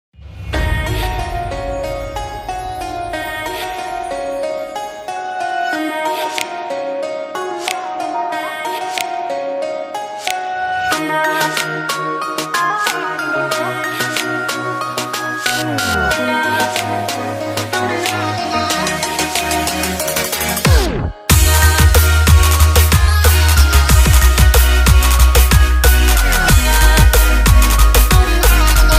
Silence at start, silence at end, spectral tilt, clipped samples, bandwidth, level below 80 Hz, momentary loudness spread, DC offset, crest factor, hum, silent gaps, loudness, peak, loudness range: 0.2 s; 0 s; -4 dB/octave; under 0.1%; 16 kHz; -16 dBFS; 12 LU; under 0.1%; 14 dB; none; none; -15 LUFS; 0 dBFS; 11 LU